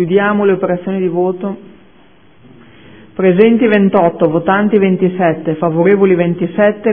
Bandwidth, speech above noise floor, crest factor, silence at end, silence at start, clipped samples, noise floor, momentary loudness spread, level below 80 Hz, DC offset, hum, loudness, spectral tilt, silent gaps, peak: 3.6 kHz; 35 dB; 12 dB; 0 s; 0 s; under 0.1%; -46 dBFS; 7 LU; -54 dBFS; 0.5%; none; -12 LUFS; -11.5 dB/octave; none; 0 dBFS